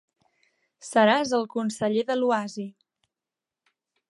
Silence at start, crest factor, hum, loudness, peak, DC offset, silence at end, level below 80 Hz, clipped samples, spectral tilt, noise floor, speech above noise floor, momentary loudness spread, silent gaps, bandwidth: 0.85 s; 22 dB; none; -24 LUFS; -6 dBFS; under 0.1%; 1.45 s; -76 dBFS; under 0.1%; -4.5 dB/octave; -89 dBFS; 65 dB; 17 LU; none; 11.5 kHz